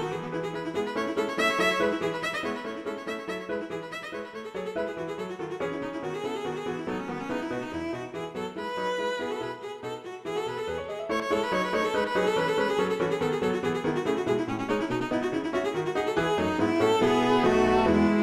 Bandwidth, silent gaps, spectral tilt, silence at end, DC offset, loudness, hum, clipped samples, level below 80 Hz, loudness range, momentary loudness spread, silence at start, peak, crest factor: 15 kHz; none; -5.5 dB/octave; 0 s; under 0.1%; -28 LUFS; none; under 0.1%; -54 dBFS; 8 LU; 12 LU; 0 s; -10 dBFS; 18 dB